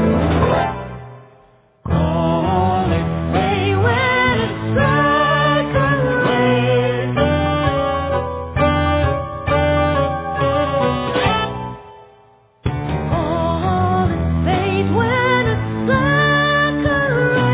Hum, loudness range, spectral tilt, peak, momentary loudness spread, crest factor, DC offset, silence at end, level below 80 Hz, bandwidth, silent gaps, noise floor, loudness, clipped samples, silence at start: none; 5 LU; -10.5 dB/octave; -2 dBFS; 8 LU; 14 dB; under 0.1%; 0 s; -30 dBFS; 4 kHz; none; -51 dBFS; -17 LUFS; under 0.1%; 0 s